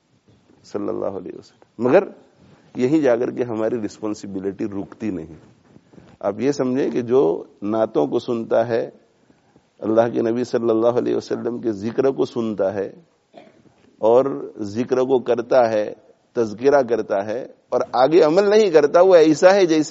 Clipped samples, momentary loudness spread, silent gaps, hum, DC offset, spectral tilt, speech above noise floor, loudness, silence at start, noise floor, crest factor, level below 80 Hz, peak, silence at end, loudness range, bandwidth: under 0.1%; 14 LU; none; none; under 0.1%; -5 dB/octave; 39 dB; -19 LUFS; 0.75 s; -57 dBFS; 20 dB; -66 dBFS; 0 dBFS; 0 s; 6 LU; 8 kHz